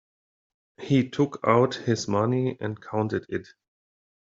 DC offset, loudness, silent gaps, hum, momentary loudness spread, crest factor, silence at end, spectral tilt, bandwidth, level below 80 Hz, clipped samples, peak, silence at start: under 0.1%; -26 LUFS; none; none; 12 LU; 22 dB; 0.8 s; -6.5 dB/octave; 7.8 kHz; -66 dBFS; under 0.1%; -4 dBFS; 0.8 s